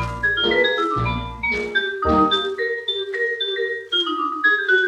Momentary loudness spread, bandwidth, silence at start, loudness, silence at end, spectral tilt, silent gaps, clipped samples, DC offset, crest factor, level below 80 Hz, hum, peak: 6 LU; 11 kHz; 0 s; -20 LUFS; 0 s; -5 dB/octave; none; under 0.1%; under 0.1%; 16 dB; -40 dBFS; none; -6 dBFS